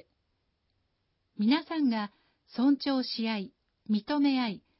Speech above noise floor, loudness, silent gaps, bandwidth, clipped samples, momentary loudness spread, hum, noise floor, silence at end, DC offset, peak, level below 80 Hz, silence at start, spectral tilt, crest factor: 49 dB; -29 LUFS; none; 5.8 kHz; under 0.1%; 10 LU; none; -77 dBFS; 0.2 s; under 0.1%; -14 dBFS; -76 dBFS; 1.4 s; -9 dB/octave; 16 dB